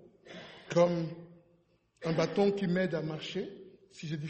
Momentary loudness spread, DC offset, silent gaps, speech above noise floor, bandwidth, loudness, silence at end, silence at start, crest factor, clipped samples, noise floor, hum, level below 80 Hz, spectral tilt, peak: 21 LU; under 0.1%; none; 39 dB; 8.4 kHz; -32 LUFS; 0 s; 0.25 s; 20 dB; under 0.1%; -70 dBFS; none; -72 dBFS; -6.5 dB/octave; -14 dBFS